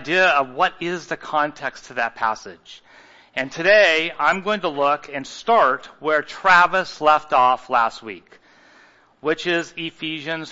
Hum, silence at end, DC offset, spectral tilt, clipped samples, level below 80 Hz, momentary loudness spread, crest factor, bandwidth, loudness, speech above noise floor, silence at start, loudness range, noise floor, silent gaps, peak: none; 0 s; under 0.1%; -3.5 dB/octave; under 0.1%; -62 dBFS; 15 LU; 20 dB; 8 kHz; -19 LUFS; 33 dB; 0 s; 5 LU; -53 dBFS; none; -2 dBFS